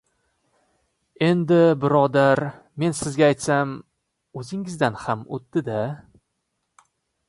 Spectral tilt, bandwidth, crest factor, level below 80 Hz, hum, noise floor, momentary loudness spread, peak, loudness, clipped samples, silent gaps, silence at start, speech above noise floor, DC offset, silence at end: -6 dB/octave; 11.5 kHz; 18 dB; -60 dBFS; none; -76 dBFS; 15 LU; -4 dBFS; -22 LUFS; under 0.1%; none; 1.2 s; 55 dB; under 0.1%; 1.3 s